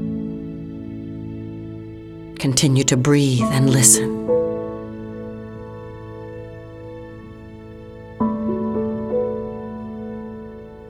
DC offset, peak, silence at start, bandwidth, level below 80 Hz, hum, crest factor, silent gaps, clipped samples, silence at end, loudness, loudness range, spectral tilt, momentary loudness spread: under 0.1%; 0 dBFS; 0 s; 17 kHz; -46 dBFS; none; 22 dB; none; under 0.1%; 0 s; -19 LUFS; 15 LU; -4.5 dB/octave; 21 LU